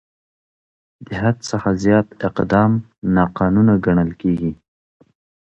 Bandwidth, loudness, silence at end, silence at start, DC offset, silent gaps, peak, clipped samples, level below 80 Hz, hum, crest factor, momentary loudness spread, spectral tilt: 8.2 kHz; -18 LUFS; 0.95 s; 1 s; under 0.1%; 2.98-3.02 s; 0 dBFS; under 0.1%; -42 dBFS; none; 18 dB; 8 LU; -8 dB/octave